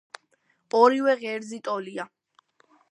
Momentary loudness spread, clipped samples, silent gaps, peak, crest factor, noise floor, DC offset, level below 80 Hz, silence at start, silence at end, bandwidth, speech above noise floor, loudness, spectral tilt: 17 LU; under 0.1%; none; -4 dBFS; 22 dB; -69 dBFS; under 0.1%; -84 dBFS; 0.75 s; 0.85 s; 11 kHz; 46 dB; -24 LUFS; -4.5 dB/octave